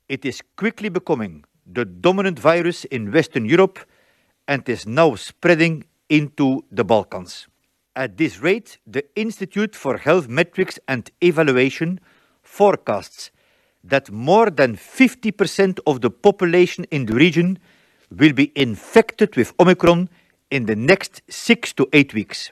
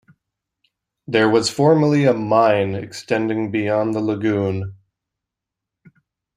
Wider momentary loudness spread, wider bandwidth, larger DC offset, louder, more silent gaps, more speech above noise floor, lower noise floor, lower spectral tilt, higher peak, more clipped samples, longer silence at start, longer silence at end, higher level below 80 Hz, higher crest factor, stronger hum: first, 12 LU vs 9 LU; about the same, 13.5 kHz vs 14.5 kHz; neither; about the same, -18 LUFS vs -18 LUFS; neither; second, 43 dB vs 67 dB; second, -61 dBFS vs -84 dBFS; about the same, -6 dB/octave vs -6 dB/octave; about the same, 0 dBFS vs -2 dBFS; neither; second, 0.1 s vs 1.1 s; second, 0.05 s vs 1.6 s; first, -54 dBFS vs -60 dBFS; about the same, 18 dB vs 18 dB; neither